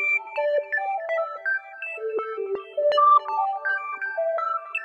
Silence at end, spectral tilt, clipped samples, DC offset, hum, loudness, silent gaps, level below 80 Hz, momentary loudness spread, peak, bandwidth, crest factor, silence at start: 0 s; -2 dB/octave; under 0.1%; under 0.1%; none; -24 LUFS; none; -80 dBFS; 11 LU; -10 dBFS; 8.4 kHz; 16 dB; 0 s